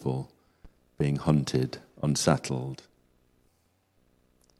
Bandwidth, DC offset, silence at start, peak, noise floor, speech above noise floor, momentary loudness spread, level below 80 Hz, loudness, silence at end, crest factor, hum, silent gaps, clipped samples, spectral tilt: 13.5 kHz; under 0.1%; 0 s; -8 dBFS; -70 dBFS; 42 dB; 13 LU; -54 dBFS; -29 LUFS; 1.85 s; 24 dB; none; none; under 0.1%; -5.5 dB/octave